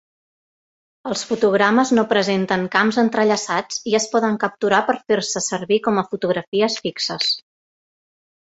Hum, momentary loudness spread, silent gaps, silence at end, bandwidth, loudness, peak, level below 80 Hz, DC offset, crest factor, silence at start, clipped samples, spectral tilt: none; 6 LU; 6.47-6.52 s; 1.1 s; 8.2 kHz; -19 LUFS; 0 dBFS; -62 dBFS; under 0.1%; 20 dB; 1.05 s; under 0.1%; -3.5 dB/octave